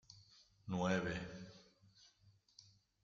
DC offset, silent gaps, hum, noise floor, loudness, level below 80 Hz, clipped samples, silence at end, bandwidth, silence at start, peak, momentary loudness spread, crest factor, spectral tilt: under 0.1%; none; none; -72 dBFS; -42 LUFS; -70 dBFS; under 0.1%; 0.4 s; 7.6 kHz; 0.1 s; -24 dBFS; 26 LU; 22 dB; -6 dB/octave